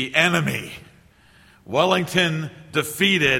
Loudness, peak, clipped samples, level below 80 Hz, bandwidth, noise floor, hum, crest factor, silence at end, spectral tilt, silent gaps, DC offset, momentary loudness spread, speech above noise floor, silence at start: -21 LUFS; 0 dBFS; under 0.1%; -54 dBFS; 16.5 kHz; -53 dBFS; none; 22 dB; 0 s; -4 dB/octave; none; under 0.1%; 12 LU; 32 dB; 0 s